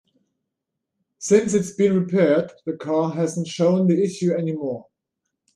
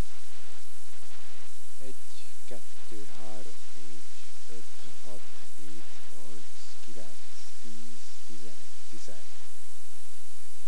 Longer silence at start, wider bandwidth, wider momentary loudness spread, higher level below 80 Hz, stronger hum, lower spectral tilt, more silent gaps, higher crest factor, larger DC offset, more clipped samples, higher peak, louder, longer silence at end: first, 1.2 s vs 0 s; second, 11.5 kHz vs over 20 kHz; first, 12 LU vs 3 LU; first, -66 dBFS vs -74 dBFS; neither; first, -6.5 dB/octave vs -4 dB/octave; neither; about the same, 18 dB vs 20 dB; second, under 0.1% vs 20%; neither; first, -4 dBFS vs -14 dBFS; first, -21 LUFS vs -48 LUFS; first, 0.75 s vs 0 s